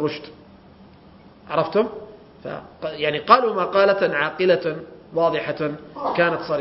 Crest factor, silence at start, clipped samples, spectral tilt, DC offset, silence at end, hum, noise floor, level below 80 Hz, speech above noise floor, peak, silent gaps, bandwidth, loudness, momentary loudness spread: 22 dB; 0 s; under 0.1%; -8 dB/octave; under 0.1%; 0 s; none; -48 dBFS; -60 dBFS; 27 dB; 0 dBFS; none; 5.8 kHz; -21 LUFS; 18 LU